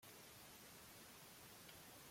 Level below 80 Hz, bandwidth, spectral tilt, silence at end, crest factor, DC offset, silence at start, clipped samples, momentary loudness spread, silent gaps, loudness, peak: -82 dBFS; 16.5 kHz; -2 dB/octave; 0 s; 14 dB; under 0.1%; 0 s; under 0.1%; 1 LU; none; -59 LUFS; -46 dBFS